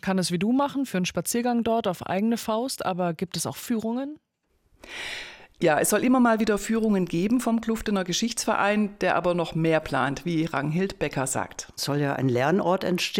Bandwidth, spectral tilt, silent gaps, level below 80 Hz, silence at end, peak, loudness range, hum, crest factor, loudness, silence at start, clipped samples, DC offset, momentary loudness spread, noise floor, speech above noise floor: 17 kHz; -4.5 dB/octave; none; -54 dBFS; 0 s; -10 dBFS; 5 LU; none; 16 dB; -25 LUFS; 0.05 s; under 0.1%; under 0.1%; 9 LU; -69 dBFS; 44 dB